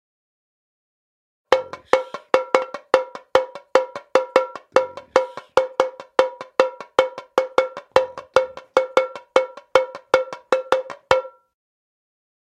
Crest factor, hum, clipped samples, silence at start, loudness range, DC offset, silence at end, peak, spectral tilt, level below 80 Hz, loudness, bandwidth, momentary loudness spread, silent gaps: 22 dB; none; under 0.1%; 1.5 s; 2 LU; under 0.1%; 1.25 s; 0 dBFS; -3 dB/octave; -62 dBFS; -21 LUFS; 11 kHz; 3 LU; none